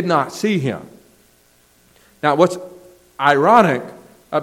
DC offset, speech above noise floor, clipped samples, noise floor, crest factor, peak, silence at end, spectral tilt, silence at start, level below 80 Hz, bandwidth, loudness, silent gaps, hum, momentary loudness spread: under 0.1%; 39 dB; under 0.1%; -55 dBFS; 18 dB; 0 dBFS; 0 s; -6 dB/octave; 0 s; -62 dBFS; 16.5 kHz; -16 LUFS; none; none; 20 LU